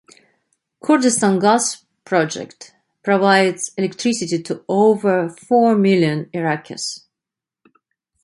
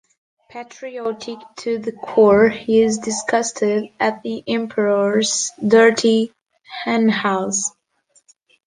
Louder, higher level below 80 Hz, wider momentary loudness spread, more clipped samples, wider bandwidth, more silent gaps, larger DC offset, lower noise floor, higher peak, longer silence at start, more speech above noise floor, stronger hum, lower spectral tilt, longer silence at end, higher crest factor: about the same, -18 LUFS vs -18 LUFS; second, -66 dBFS vs -58 dBFS; second, 13 LU vs 17 LU; neither; first, 11.5 kHz vs 10 kHz; neither; neither; first, -86 dBFS vs -60 dBFS; about the same, 0 dBFS vs -2 dBFS; first, 0.85 s vs 0.55 s; first, 70 dB vs 42 dB; neither; about the same, -4.5 dB/octave vs -3.5 dB/octave; first, 1.25 s vs 0.95 s; about the same, 18 dB vs 16 dB